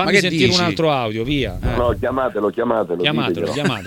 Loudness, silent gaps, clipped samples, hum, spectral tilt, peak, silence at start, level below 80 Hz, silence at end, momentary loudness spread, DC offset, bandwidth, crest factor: -18 LUFS; none; under 0.1%; none; -5 dB/octave; 0 dBFS; 0 s; -34 dBFS; 0 s; 6 LU; under 0.1%; 17 kHz; 18 dB